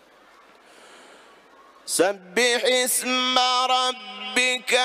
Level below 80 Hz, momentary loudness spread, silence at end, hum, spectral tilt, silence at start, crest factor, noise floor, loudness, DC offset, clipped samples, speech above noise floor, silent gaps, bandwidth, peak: -78 dBFS; 7 LU; 0 s; none; 0 dB/octave; 1.85 s; 20 dB; -53 dBFS; -21 LUFS; under 0.1%; under 0.1%; 31 dB; none; 15.5 kHz; -4 dBFS